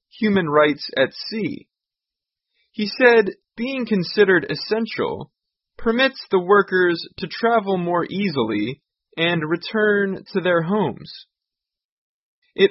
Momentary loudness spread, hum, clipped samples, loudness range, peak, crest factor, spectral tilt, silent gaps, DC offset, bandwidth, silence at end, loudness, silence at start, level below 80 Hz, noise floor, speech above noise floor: 13 LU; none; under 0.1%; 3 LU; -2 dBFS; 20 dB; -9 dB/octave; 11.85-12.42 s; under 0.1%; 5.8 kHz; 0 s; -20 LUFS; 0.15 s; -58 dBFS; -87 dBFS; 67 dB